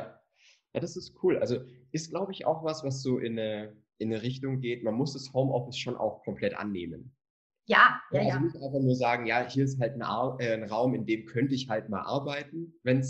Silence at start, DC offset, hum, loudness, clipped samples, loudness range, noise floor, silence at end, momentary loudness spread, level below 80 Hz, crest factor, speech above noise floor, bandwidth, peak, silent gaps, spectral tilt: 0 s; under 0.1%; none; -30 LUFS; under 0.1%; 6 LU; -65 dBFS; 0 s; 10 LU; -66 dBFS; 24 dB; 35 dB; 8.4 kHz; -6 dBFS; 7.30-7.50 s; -6 dB/octave